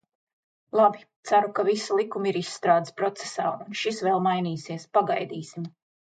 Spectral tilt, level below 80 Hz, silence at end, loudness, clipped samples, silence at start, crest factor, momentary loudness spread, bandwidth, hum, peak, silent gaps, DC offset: -5 dB/octave; -78 dBFS; 0.35 s; -26 LUFS; under 0.1%; 0.75 s; 18 dB; 13 LU; 9.4 kHz; none; -8 dBFS; 1.16-1.23 s; under 0.1%